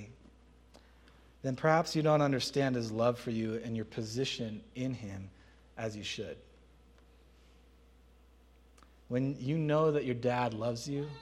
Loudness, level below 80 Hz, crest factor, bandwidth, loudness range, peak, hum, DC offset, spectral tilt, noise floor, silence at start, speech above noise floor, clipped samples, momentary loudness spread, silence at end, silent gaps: -33 LUFS; -62 dBFS; 24 dB; 14 kHz; 14 LU; -12 dBFS; none; under 0.1%; -6 dB/octave; -61 dBFS; 0 s; 29 dB; under 0.1%; 13 LU; 0 s; none